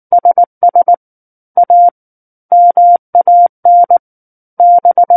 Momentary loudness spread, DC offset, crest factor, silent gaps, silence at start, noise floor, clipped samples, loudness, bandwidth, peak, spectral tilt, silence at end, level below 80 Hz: 6 LU; under 0.1%; 8 dB; 0.47-0.61 s, 0.97-1.55 s, 1.91-2.49 s, 2.99-3.13 s, 3.49-3.63 s, 3.99-4.57 s; 0.1 s; under -90 dBFS; under 0.1%; -9 LUFS; 1.8 kHz; 0 dBFS; -10 dB/octave; 0 s; -68 dBFS